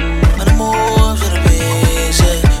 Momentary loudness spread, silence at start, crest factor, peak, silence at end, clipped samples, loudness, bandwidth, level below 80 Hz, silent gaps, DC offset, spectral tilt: 2 LU; 0 s; 10 dB; 0 dBFS; 0 s; under 0.1%; -13 LUFS; 16.5 kHz; -14 dBFS; none; under 0.1%; -5 dB/octave